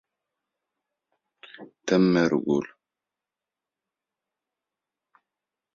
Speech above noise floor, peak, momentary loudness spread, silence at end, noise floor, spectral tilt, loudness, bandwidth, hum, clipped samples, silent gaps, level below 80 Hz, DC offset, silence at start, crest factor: 66 dB; -8 dBFS; 24 LU; 3.1 s; -89 dBFS; -6.5 dB/octave; -23 LUFS; 7.6 kHz; 50 Hz at -65 dBFS; under 0.1%; none; -68 dBFS; under 0.1%; 1.6 s; 22 dB